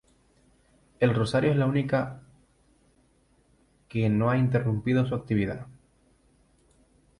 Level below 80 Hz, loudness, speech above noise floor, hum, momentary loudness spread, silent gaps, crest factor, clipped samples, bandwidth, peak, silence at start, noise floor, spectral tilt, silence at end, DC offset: -56 dBFS; -26 LUFS; 40 dB; none; 12 LU; none; 18 dB; under 0.1%; 11 kHz; -10 dBFS; 1 s; -64 dBFS; -8 dB/octave; 1.5 s; under 0.1%